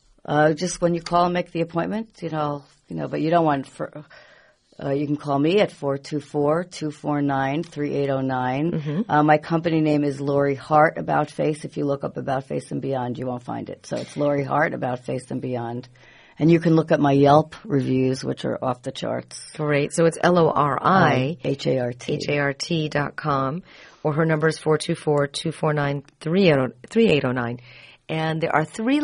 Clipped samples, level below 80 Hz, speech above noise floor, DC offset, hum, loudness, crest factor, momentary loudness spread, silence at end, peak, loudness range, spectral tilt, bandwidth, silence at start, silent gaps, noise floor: under 0.1%; -56 dBFS; 33 dB; under 0.1%; none; -22 LUFS; 20 dB; 11 LU; 0 s; -2 dBFS; 5 LU; -6.5 dB/octave; 10.5 kHz; 0.3 s; none; -55 dBFS